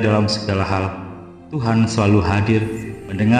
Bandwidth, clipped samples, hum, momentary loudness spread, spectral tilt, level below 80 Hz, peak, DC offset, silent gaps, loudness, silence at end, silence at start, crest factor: 9.8 kHz; under 0.1%; none; 14 LU; -6.5 dB/octave; -42 dBFS; -2 dBFS; under 0.1%; none; -19 LUFS; 0 s; 0 s; 16 dB